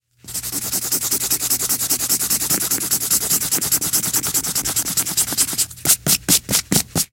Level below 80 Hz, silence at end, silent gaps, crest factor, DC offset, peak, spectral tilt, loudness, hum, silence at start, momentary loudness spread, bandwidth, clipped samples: -48 dBFS; 0.05 s; none; 20 dB; under 0.1%; 0 dBFS; -1 dB/octave; -17 LUFS; none; 0.25 s; 4 LU; 17 kHz; under 0.1%